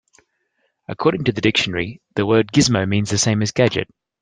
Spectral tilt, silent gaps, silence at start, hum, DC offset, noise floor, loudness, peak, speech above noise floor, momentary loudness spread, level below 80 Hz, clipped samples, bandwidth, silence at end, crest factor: -4.5 dB/octave; none; 0.9 s; none; under 0.1%; -69 dBFS; -18 LUFS; -2 dBFS; 51 dB; 10 LU; -50 dBFS; under 0.1%; 10.5 kHz; 0.35 s; 16 dB